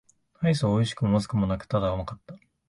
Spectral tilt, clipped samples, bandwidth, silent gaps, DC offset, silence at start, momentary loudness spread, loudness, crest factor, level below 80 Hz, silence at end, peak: -7 dB/octave; under 0.1%; 11.5 kHz; none; under 0.1%; 0.4 s; 10 LU; -26 LUFS; 16 dB; -46 dBFS; 0.3 s; -10 dBFS